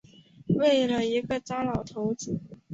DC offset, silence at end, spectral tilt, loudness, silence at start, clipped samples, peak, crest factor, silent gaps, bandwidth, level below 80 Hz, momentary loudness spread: under 0.1%; 0 s; -5.5 dB/octave; -27 LUFS; 0.45 s; under 0.1%; -12 dBFS; 16 dB; none; 8 kHz; -56 dBFS; 12 LU